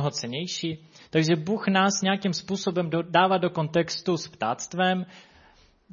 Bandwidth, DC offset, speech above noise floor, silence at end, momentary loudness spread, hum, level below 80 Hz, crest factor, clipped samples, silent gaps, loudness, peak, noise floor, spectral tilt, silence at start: 7.4 kHz; under 0.1%; 32 dB; 0 s; 9 LU; none; -66 dBFS; 20 dB; under 0.1%; none; -25 LUFS; -6 dBFS; -58 dBFS; -4.5 dB/octave; 0 s